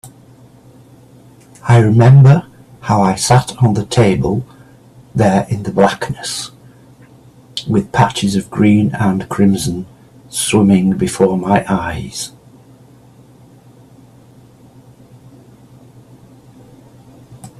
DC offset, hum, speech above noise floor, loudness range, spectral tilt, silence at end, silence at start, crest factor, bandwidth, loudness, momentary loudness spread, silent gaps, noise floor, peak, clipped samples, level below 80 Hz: under 0.1%; none; 31 dB; 8 LU; -6 dB/octave; 0.1 s; 0.05 s; 16 dB; 13 kHz; -13 LUFS; 15 LU; none; -43 dBFS; 0 dBFS; under 0.1%; -44 dBFS